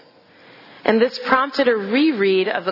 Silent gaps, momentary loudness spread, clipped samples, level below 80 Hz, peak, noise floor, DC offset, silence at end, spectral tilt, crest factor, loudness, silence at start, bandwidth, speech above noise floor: none; 3 LU; under 0.1%; -66 dBFS; 0 dBFS; -49 dBFS; under 0.1%; 0 s; -6 dB/octave; 20 dB; -18 LUFS; 0.85 s; 5.8 kHz; 31 dB